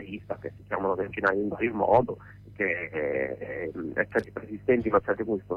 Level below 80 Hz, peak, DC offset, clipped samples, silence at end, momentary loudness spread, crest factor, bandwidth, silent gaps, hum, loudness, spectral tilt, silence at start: -56 dBFS; -10 dBFS; under 0.1%; under 0.1%; 0 s; 13 LU; 18 dB; 6.4 kHz; none; none; -28 LUFS; -8.5 dB/octave; 0 s